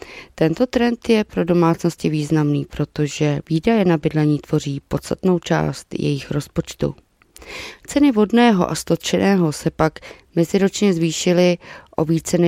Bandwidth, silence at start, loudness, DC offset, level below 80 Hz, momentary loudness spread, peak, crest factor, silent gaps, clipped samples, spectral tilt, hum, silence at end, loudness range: 15.5 kHz; 0.05 s; -19 LUFS; under 0.1%; -46 dBFS; 10 LU; 0 dBFS; 18 dB; none; under 0.1%; -6 dB/octave; none; 0 s; 4 LU